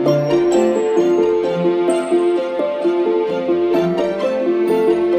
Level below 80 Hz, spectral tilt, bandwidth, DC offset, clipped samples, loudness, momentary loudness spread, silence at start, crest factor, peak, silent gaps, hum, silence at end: -56 dBFS; -6.5 dB/octave; 9.6 kHz; under 0.1%; under 0.1%; -16 LUFS; 4 LU; 0 s; 12 dB; -4 dBFS; none; none; 0 s